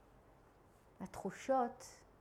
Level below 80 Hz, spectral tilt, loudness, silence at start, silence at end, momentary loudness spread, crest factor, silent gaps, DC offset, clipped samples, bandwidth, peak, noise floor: -70 dBFS; -5.5 dB/octave; -40 LUFS; 1 s; 0.2 s; 18 LU; 18 dB; none; under 0.1%; under 0.1%; 15 kHz; -24 dBFS; -66 dBFS